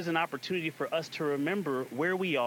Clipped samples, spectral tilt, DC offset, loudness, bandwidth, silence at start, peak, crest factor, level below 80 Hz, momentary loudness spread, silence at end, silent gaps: under 0.1%; -5.5 dB/octave; under 0.1%; -32 LUFS; 18.5 kHz; 0 s; -14 dBFS; 16 dB; -82 dBFS; 3 LU; 0 s; none